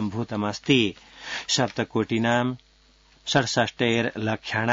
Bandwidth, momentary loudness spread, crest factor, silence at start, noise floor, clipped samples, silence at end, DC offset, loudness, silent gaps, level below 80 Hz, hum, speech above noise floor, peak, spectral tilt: 7.8 kHz; 11 LU; 20 dB; 0 s; -58 dBFS; under 0.1%; 0 s; under 0.1%; -24 LUFS; none; -60 dBFS; none; 33 dB; -6 dBFS; -4.5 dB/octave